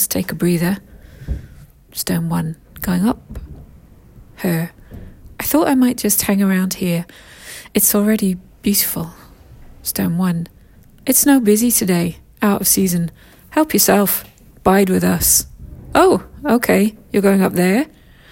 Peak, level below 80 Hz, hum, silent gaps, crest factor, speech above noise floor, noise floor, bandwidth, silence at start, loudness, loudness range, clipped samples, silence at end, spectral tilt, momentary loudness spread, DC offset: 0 dBFS; -40 dBFS; none; none; 18 dB; 29 dB; -45 dBFS; 17 kHz; 0 s; -16 LUFS; 8 LU; under 0.1%; 0.45 s; -4.5 dB/octave; 16 LU; under 0.1%